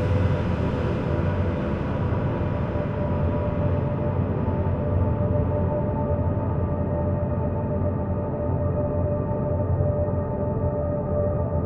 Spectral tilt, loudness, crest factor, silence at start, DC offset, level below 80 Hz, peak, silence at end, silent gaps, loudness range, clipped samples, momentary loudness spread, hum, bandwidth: -10.5 dB/octave; -25 LUFS; 14 dB; 0 s; under 0.1%; -34 dBFS; -10 dBFS; 0 s; none; 1 LU; under 0.1%; 3 LU; none; 5.4 kHz